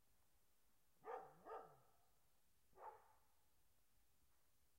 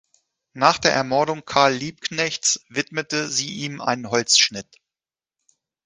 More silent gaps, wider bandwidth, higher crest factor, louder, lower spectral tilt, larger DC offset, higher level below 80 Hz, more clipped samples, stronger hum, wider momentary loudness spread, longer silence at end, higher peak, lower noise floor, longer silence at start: neither; first, 16 kHz vs 10.5 kHz; about the same, 24 dB vs 22 dB; second, -60 LUFS vs -20 LUFS; first, -4.5 dB/octave vs -2 dB/octave; neither; second, -88 dBFS vs -60 dBFS; neither; neither; second, 7 LU vs 10 LU; second, 0.15 s vs 1.25 s; second, -40 dBFS vs 0 dBFS; second, -84 dBFS vs under -90 dBFS; second, 0.1 s vs 0.55 s